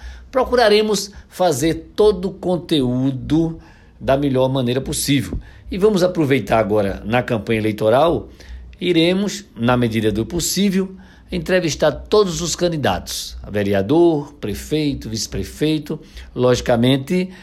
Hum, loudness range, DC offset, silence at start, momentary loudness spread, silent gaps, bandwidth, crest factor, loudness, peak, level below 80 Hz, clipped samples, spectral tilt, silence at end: none; 2 LU; under 0.1%; 0 s; 11 LU; none; 15.5 kHz; 14 dB; -18 LUFS; -4 dBFS; -38 dBFS; under 0.1%; -5 dB/octave; 0 s